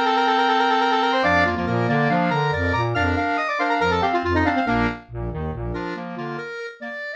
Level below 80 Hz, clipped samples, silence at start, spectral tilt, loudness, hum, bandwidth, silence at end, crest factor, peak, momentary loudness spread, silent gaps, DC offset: -40 dBFS; under 0.1%; 0 s; -6.5 dB/octave; -21 LUFS; none; 8.4 kHz; 0 s; 14 dB; -8 dBFS; 12 LU; none; under 0.1%